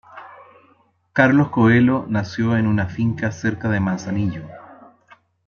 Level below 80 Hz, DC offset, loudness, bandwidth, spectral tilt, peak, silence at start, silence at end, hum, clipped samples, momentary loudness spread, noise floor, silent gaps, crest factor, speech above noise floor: -54 dBFS; under 0.1%; -19 LUFS; 7 kHz; -7.5 dB/octave; -2 dBFS; 0.15 s; 0.75 s; none; under 0.1%; 12 LU; -58 dBFS; none; 18 dB; 40 dB